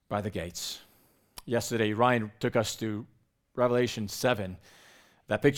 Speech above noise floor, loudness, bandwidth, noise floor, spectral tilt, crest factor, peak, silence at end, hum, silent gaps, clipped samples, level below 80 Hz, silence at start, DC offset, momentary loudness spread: 36 dB; -30 LUFS; 19 kHz; -65 dBFS; -5 dB/octave; 22 dB; -8 dBFS; 0 s; none; none; under 0.1%; -60 dBFS; 0.1 s; under 0.1%; 16 LU